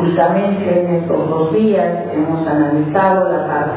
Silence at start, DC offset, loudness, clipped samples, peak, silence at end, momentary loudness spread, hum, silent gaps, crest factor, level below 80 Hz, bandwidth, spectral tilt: 0 s; under 0.1%; -15 LUFS; under 0.1%; -2 dBFS; 0 s; 4 LU; none; none; 12 dB; -50 dBFS; 4 kHz; -12 dB/octave